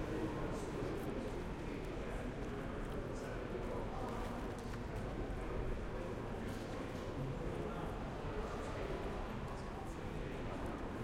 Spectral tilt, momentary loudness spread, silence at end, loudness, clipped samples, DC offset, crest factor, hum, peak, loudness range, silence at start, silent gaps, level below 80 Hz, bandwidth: -6.5 dB/octave; 2 LU; 0 s; -44 LUFS; under 0.1%; under 0.1%; 14 dB; none; -28 dBFS; 0 LU; 0 s; none; -48 dBFS; 16 kHz